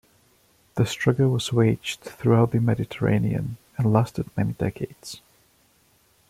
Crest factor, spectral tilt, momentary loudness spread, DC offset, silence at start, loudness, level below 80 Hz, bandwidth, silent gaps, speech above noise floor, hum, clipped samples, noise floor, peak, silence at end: 20 dB; -7 dB/octave; 14 LU; under 0.1%; 0.75 s; -24 LUFS; -52 dBFS; 14.5 kHz; none; 39 dB; none; under 0.1%; -62 dBFS; -6 dBFS; 1.1 s